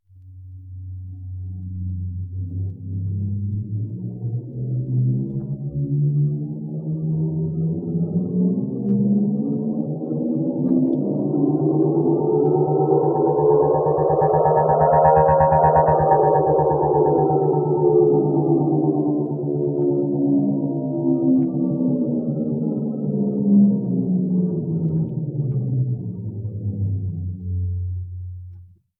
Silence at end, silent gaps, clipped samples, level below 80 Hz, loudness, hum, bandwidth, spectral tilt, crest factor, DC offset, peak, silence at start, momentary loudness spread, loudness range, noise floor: 0.35 s; none; under 0.1%; -46 dBFS; -20 LUFS; none; 2.6 kHz; -16 dB/octave; 18 dB; under 0.1%; -2 dBFS; 0.15 s; 13 LU; 10 LU; -43 dBFS